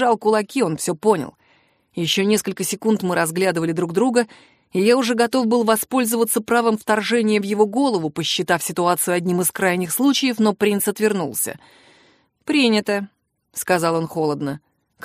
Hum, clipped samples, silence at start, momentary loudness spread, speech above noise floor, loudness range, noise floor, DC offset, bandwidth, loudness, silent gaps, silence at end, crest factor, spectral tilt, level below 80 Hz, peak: none; under 0.1%; 0 s; 8 LU; 40 dB; 3 LU; -59 dBFS; under 0.1%; 15.5 kHz; -19 LUFS; none; 0.45 s; 16 dB; -4 dB/octave; -66 dBFS; -2 dBFS